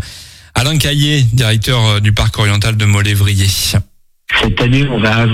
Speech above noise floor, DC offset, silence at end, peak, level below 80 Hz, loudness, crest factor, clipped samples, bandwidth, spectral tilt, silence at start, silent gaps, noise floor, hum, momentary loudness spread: 23 dB; under 0.1%; 0 s; 0 dBFS; -28 dBFS; -12 LUFS; 12 dB; under 0.1%; 16 kHz; -4.5 dB/octave; 0 s; none; -34 dBFS; none; 5 LU